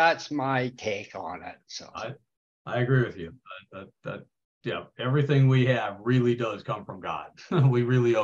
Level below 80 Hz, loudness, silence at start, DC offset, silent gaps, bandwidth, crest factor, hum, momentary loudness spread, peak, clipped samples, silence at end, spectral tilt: -64 dBFS; -26 LUFS; 0 s; under 0.1%; 2.37-2.65 s, 4.45-4.61 s; 7 kHz; 18 dB; none; 19 LU; -8 dBFS; under 0.1%; 0 s; -7 dB/octave